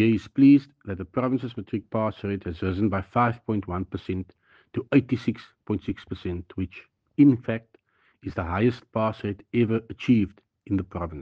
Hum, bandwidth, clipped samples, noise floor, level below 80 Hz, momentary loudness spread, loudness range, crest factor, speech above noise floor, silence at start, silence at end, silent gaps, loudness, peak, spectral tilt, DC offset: none; 6.2 kHz; under 0.1%; -62 dBFS; -52 dBFS; 15 LU; 5 LU; 18 dB; 38 dB; 0 s; 0 s; none; -26 LUFS; -6 dBFS; -9 dB/octave; under 0.1%